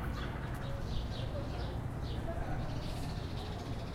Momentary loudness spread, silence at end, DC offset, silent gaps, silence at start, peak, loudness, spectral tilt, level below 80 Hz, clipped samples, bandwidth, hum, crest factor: 2 LU; 0 s; under 0.1%; none; 0 s; -24 dBFS; -40 LUFS; -6.5 dB/octave; -42 dBFS; under 0.1%; 16.5 kHz; none; 14 dB